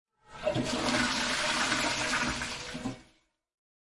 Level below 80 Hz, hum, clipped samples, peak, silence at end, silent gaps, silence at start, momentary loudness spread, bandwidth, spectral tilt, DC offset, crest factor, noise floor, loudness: -52 dBFS; none; under 0.1%; -16 dBFS; 0.8 s; none; 0.3 s; 11 LU; 11.5 kHz; -2.5 dB/octave; under 0.1%; 18 dB; -67 dBFS; -30 LUFS